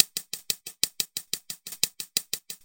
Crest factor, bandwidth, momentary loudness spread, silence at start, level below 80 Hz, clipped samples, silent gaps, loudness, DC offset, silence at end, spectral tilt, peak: 32 dB; 17 kHz; 8 LU; 0 s; -70 dBFS; under 0.1%; none; -29 LUFS; under 0.1%; 0.1 s; 1 dB/octave; 0 dBFS